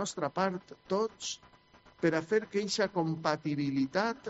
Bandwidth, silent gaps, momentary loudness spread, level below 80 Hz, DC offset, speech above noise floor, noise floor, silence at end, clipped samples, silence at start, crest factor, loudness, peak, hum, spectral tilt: 8 kHz; none; 7 LU; -70 dBFS; under 0.1%; 29 dB; -61 dBFS; 0 s; under 0.1%; 0 s; 20 dB; -32 LUFS; -14 dBFS; none; -4.5 dB/octave